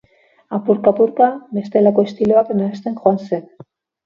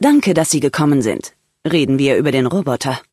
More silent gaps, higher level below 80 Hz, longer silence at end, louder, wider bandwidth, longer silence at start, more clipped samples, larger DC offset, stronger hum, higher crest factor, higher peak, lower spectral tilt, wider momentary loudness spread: neither; second, -60 dBFS vs -54 dBFS; first, 0.65 s vs 0.1 s; about the same, -17 LUFS vs -15 LUFS; second, 7 kHz vs 12 kHz; first, 0.5 s vs 0 s; neither; neither; neither; about the same, 16 dB vs 14 dB; about the same, 0 dBFS vs -2 dBFS; first, -9 dB/octave vs -5 dB/octave; about the same, 11 LU vs 9 LU